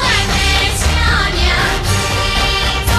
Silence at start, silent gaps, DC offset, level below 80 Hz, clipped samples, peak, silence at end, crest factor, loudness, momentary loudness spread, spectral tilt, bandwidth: 0 s; none; under 0.1%; -20 dBFS; under 0.1%; 0 dBFS; 0 s; 12 dB; -13 LUFS; 2 LU; -3 dB/octave; 15 kHz